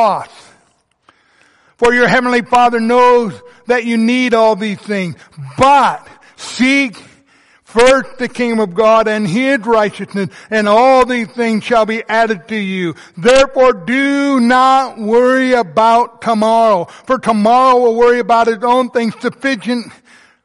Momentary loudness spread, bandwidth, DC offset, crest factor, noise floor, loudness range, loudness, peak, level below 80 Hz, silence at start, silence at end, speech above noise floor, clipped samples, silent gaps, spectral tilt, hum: 11 LU; 11.5 kHz; under 0.1%; 12 dB; -57 dBFS; 3 LU; -12 LUFS; 0 dBFS; -46 dBFS; 0 s; 0.55 s; 45 dB; under 0.1%; none; -5 dB/octave; none